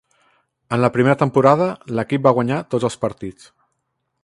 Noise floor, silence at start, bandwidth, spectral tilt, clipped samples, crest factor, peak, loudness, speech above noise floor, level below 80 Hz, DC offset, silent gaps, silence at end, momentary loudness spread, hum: -73 dBFS; 0.7 s; 11.5 kHz; -7 dB/octave; under 0.1%; 18 dB; 0 dBFS; -18 LUFS; 56 dB; -56 dBFS; under 0.1%; none; 0.9 s; 11 LU; none